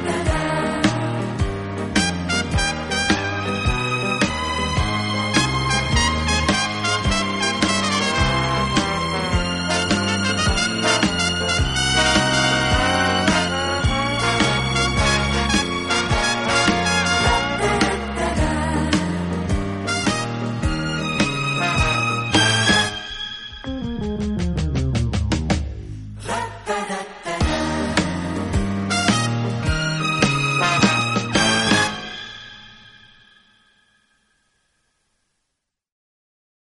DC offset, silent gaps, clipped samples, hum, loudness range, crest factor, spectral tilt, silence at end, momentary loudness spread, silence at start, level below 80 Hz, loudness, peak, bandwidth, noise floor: under 0.1%; none; under 0.1%; none; 6 LU; 20 dB; -4 dB/octave; 3.85 s; 8 LU; 0 s; -32 dBFS; -20 LUFS; -2 dBFS; 11.5 kHz; -78 dBFS